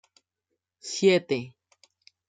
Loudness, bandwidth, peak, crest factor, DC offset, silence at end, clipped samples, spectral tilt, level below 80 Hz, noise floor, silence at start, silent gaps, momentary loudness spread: -25 LUFS; 9.4 kHz; -10 dBFS; 20 dB; under 0.1%; 0.8 s; under 0.1%; -4.5 dB/octave; -76 dBFS; -83 dBFS; 0.85 s; none; 21 LU